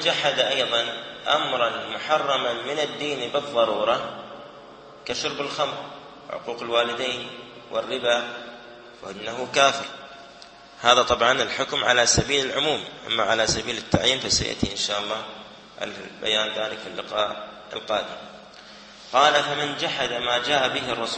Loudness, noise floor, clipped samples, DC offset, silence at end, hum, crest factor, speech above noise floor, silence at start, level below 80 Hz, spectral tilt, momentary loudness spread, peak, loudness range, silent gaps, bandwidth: -23 LUFS; -46 dBFS; under 0.1%; under 0.1%; 0 s; none; 24 dB; 22 dB; 0 s; -52 dBFS; -2 dB/octave; 21 LU; -2 dBFS; 7 LU; none; 8.8 kHz